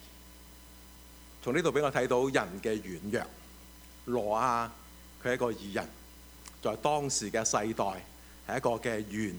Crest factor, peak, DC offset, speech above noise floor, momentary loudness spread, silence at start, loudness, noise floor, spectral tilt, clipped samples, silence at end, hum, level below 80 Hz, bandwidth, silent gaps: 22 dB; -10 dBFS; under 0.1%; 21 dB; 23 LU; 0 s; -32 LUFS; -52 dBFS; -4 dB/octave; under 0.1%; 0 s; none; -56 dBFS; over 20 kHz; none